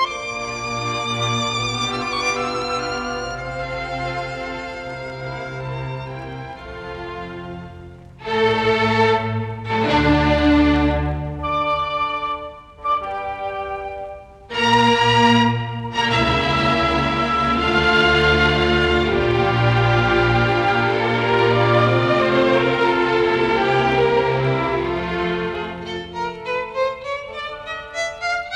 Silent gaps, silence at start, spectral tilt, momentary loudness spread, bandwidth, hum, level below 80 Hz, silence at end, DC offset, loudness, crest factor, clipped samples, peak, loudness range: none; 0 s; -5.5 dB/octave; 14 LU; 11 kHz; none; -36 dBFS; 0 s; under 0.1%; -19 LUFS; 18 dB; under 0.1%; -2 dBFS; 10 LU